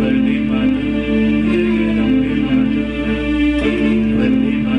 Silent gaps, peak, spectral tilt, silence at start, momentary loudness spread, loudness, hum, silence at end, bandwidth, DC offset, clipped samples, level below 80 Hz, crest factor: none; -6 dBFS; -8 dB/octave; 0 s; 3 LU; -16 LUFS; none; 0 s; 8.6 kHz; under 0.1%; under 0.1%; -30 dBFS; 10 dB